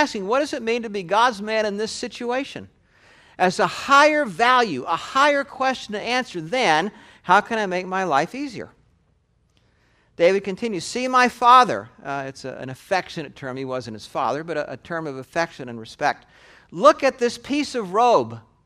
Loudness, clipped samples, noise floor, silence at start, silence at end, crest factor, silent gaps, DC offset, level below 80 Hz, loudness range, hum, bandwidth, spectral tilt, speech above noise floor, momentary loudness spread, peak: -21 LUFS; under 0.1%; -63 dBFS; 0 s; 0.25 s; 22 dB; none; under 0.1%; -62 dBFS; 8 LU; none; 14.5 kHz; -4 dB/octave; 42 dB; 16 LU; 0 dBFS